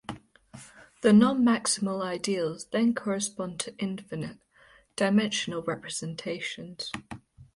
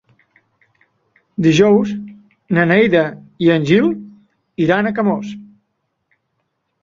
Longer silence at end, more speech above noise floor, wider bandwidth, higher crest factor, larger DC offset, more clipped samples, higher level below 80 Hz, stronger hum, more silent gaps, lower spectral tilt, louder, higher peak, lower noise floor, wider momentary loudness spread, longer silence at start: second, 0.1 s vs 1.4 s; second, 32 dB vs 57 dB; first, 11.5 kHz vs 7.4 kHz; about the same, 20 dB vs 18 dB; neither; neither; second, -64 dBFS vs -54 dBFS; neither; neither; second, -4.5 dB/octave vs -6.5 dB/octave; second, -28 LUFS vs -15 LUFS; second, -10 dBFS vs 0 dBFS; second, -59 dBFS vs -70 dBFS; about the same, 19 LU vs 18 LU; second, 0.1 s vs 1.4 s